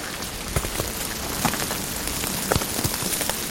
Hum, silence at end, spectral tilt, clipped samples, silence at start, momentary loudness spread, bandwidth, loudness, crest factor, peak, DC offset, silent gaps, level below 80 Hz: none; 0 s; -2.5 dB/octave; under 0.1%; 0 s; 4 LU; 17 kHz; -25 LUFS; 24 dB; -2 dBFS; under 0.1%; none; -38 dBFS